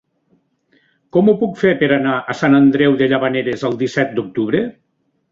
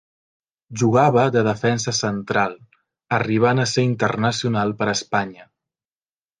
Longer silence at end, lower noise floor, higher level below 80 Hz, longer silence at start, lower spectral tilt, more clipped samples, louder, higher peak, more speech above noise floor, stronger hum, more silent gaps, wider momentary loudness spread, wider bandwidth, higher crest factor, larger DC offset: second, 0.6 s vs 0.95 s; second, -66 dBFS vs under -90 dBFS; about the same, -58 dBFS vs -58 dBFS; first, 1.15 s vs 0.7 s; first, -7 dB/octave vs -5 dB/octave; neither; first, -16 LUFS vs -20 LUFS; about the same, -2 dBFS vs -2 dBFS; second, 51 dB vs over 71 dB; neither; neither; about the same, 8 LU vs 8 LU; second, 7.4 kHz vs 10 kHz; about the same, 16 dB vs 18 dB; neither